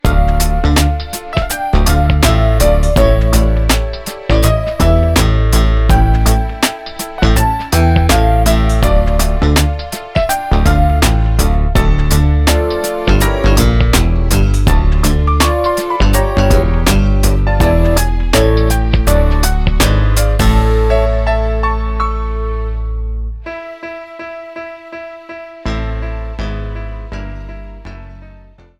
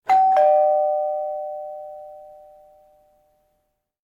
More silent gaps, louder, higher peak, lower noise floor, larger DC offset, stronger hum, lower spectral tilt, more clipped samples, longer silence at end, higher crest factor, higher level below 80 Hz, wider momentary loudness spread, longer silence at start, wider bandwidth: neither; first, -13 LUFS vs -19 LUFS; first, 0 dBFS vs -8 dBFS; second, -39 dBFS vs -72 dBFS; neither; neither; first, -5.5 dB/octave vs -3.5 dB/octave; neither; second, 0.5 s vs 1.8 s; about the same, 12 dB vs 14 dB; first, -14 dBFS vs -72 dBFS; second, 15 LU vs 22 LU; about the same, 0.05 s vs 0.05 s; first, 17.5 kHz vs 7.2 kHz